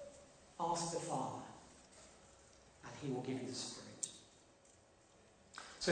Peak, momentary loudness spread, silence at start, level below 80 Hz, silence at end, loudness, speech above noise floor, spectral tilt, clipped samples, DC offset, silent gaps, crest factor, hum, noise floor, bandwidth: -22 dBFS; 23 LU; 0 s; -74 dBFS; 0 s; -44 LUFS; 24 dB; -3.5 dB/octave; under 0.1%; under 0.1%; none; 24 dB; none; -67 dBFS; 9.4 kHz